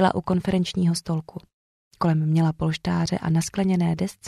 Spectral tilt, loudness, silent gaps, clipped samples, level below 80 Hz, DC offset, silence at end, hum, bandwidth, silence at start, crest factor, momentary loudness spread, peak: -6.5 dB/octave; -24 LUFS; 1.54-1.91 s; under 0.1%; -50 dBFS; under 0.1%; 0 s; none; 12.5 kHz; 0 s; 18 dB; 7 LU; -6 dBFS